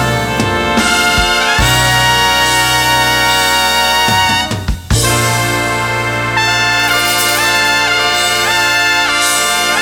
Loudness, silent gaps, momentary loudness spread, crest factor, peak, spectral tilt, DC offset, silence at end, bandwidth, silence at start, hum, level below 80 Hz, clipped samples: -10 LUFS; none; 5 LU; 12 dB; 0 dBFS; -2.5 dB/octave; under 0.1%; 0 s; over 20 kHz; 0 s; none; -28 dBFS; under 0.1%